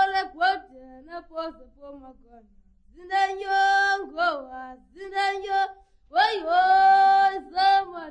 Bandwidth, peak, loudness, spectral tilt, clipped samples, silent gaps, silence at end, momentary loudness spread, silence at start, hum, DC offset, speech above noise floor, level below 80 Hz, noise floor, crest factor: 9.6 kHz; -8 dBFS; -22 LUFS; -1.5 dB/octave; under 0.1%; none; 0 s; 20 LU; 0 s; none; under 0.1%; 23 dB; -58 dBFS; -47 dBFS; 16 dB